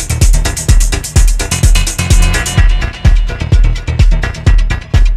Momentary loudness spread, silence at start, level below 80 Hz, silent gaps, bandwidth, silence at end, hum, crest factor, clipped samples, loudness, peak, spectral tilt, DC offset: 3 LU; 0 s; -10 dBFS; none; 14 kHz; 0 s; none; 8 dB; 0.2%; -12 LUFS; 0 dBFS; -4 dB/octave; under 0.1%